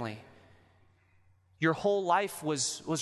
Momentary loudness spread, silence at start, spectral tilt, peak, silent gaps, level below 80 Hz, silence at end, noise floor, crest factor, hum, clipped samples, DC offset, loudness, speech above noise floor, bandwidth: 9 LU; 0 s; -4 dB/octave; -14 dBFS; none; -70 dBFS; 0 s; -65 dBFS; 18 dB; none; under 0.1%; under 0.1%; -30 LUFS; 35 dB; 12.5 kHz